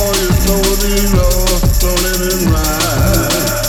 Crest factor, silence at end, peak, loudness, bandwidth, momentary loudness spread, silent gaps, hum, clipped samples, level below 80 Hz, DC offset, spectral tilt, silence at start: 12 dB; 0 s; 0 dBFS; -13 LUFS; over 20 kHz; 2 LU; none; none; under 0.1%; -16 dBFS; under 0.1%; -4 dB/octave; 0 s